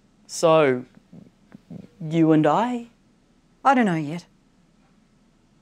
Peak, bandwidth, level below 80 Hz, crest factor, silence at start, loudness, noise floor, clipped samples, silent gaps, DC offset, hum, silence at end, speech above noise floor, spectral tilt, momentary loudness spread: -6 dBFS; 12 kHz; -66 dBFS; 18 dB; 0.3 s; -21 LUFS; -60 dBFS; under 0.1%; none; under 0.1%; none; 1.4 s; 40 dB; -6 dB/octave; 19 LU